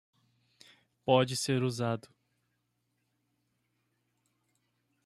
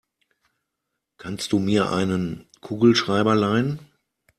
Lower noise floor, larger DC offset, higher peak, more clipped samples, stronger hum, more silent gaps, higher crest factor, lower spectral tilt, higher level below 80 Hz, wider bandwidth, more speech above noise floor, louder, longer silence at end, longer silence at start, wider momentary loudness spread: about the same, -79 dBFS vs -81 dBFS; neither; second, -10 dBFS vs -4 dBFS; neither; first, 60 Hz at -65 dBFS vs none; neither; first, 26 dB vs 18 dB; about the same, -5 dB/octave vs -6 dB/octave; second, -76 dBFS vs -58 dBFS; about the same, 14 kHz vs 14 kHz; second, 50 dB vs 60 dB; second, -31 LUFS vs -21 LUFS; first, 3.05 s vs 0.55 s; second, 1.05 s vs 1.25 s; second, 11 LU vs 17 LU